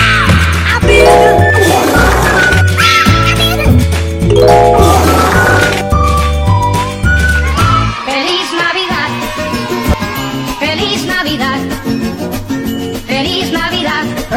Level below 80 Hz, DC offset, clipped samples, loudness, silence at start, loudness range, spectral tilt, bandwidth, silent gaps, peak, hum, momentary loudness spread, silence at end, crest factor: -20 dBFS; under 0.1%; 1%; -10 LUFS; 0 s; 7 LU; -5 dB/octave; 17 kHz; none; 0 dBFS; none; 10 LU; 0 s; 10 dB